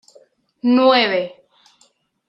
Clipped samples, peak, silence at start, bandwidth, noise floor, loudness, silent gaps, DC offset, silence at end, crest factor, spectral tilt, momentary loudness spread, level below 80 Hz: under 0.1%; -2 dBFS; 0.65 s; 7.8 kHz; -59 dBFS; -16 LUFS; none; under 0.1%; 1 s; 18 dB; -5.5 dB/octave; 11 LU; -74 dBFS